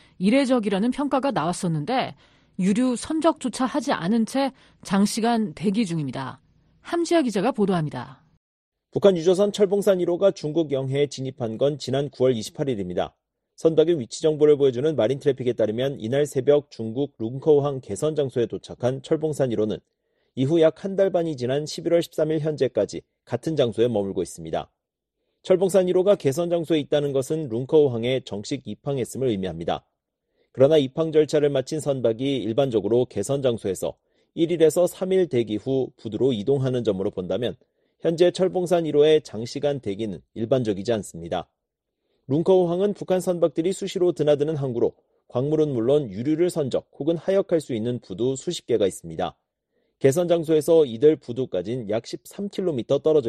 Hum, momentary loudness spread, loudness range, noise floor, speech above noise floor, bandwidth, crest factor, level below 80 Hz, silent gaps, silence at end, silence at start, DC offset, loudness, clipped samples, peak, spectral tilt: none; 10 LU; 3 LU; -81 dBFS; 59 dB; 13 kHz; 18 dB; -60 dBFS; 8.37-8.72 s; 0 s; 0.2 s; under 0.1%; -23 LUFS; under 0.1%; -4 dBFS; -6 dB/octave